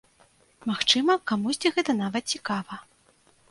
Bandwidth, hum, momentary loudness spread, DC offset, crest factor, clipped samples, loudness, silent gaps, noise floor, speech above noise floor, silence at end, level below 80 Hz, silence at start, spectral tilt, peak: 11.5 kHz; none; 13 LU; under 0.1%; 24 dB; under 0.1%; -25 LUFS; none; -62 dBFS; 36 dB; 0.7 s; -68 dBFS; 0.65 s; -3 dB/octave; -4 dBFS